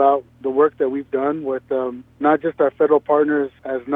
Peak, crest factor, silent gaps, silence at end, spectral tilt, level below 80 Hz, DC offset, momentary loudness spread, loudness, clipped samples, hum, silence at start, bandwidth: -4 dBFS; 16 dB; none; 0 s; -9 dB/octave; -60 dBFS; under 0.1%; 8 LU; -20 LUFS; under 0.1%; none; 0 s; 3.8 kHz